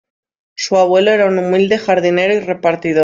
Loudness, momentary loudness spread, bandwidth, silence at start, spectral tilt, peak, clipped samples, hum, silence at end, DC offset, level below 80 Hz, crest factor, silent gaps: -13 LUFS; 5 LU; 7.6 kHz; 0.6 s; -5 dB/octave; -2 dBFS; under 0.1%; none; 0 s; under 0.1%; -58 dBFS; 12 dB; none